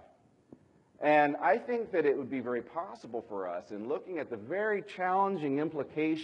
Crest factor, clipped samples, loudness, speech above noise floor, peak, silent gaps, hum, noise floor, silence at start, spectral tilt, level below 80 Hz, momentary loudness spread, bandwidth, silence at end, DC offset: 20 dB; under 0.1%; -32 LUFS; 31 dB; -12 dBFS; none; none; -63 dBFS; 1 s; -7 dB/octave; -80 dBFS; 13 LU; 8.6 kHz; 0 s; under 0.1%